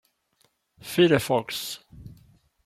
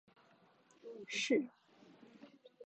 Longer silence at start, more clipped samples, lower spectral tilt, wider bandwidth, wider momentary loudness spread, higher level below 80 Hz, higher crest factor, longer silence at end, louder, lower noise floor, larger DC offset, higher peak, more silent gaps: about the same, 0.85 s vs 0.85 s; neither; first, -5 dB/octave vs -2.5 dB/octave; first, 16 kHz vs 8.8 kHz; second, 19 LU vs 26 LU; first, -58 dBFS vs under -90 dBFS; about the same, 22 dB vs 22 dB; first, 0.5 s vs 0 s; first, -24 LUFS vs -38 LUFS; about the same, -69 dBFS vs -69 dBFS; neither; first, -4 dBFS vs -22 dBFS; neither